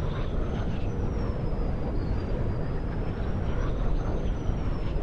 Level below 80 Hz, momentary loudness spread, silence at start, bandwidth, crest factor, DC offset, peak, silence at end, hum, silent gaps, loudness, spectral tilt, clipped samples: -30 dBFS; 1 LU; 0 s; 6.6 kHz; 14 dB; under 0.1%; -14 dBFS; 0 s; none; none; -31 LUFS; -8.5 dB/octave; under 0.1%